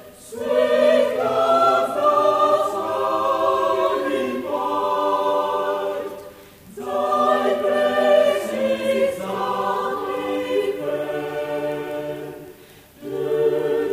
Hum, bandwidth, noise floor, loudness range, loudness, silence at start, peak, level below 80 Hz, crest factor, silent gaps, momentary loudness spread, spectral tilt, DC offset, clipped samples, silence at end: none; 15.5 kHz; -46 dBFS; 7 LU; -21 LUFS; 0 s; -6 dBFS; -60 dBFS; 16 dB; none; 12 LU; -4.5 dB/octave; under 0.1%; under 0.1%; 0 s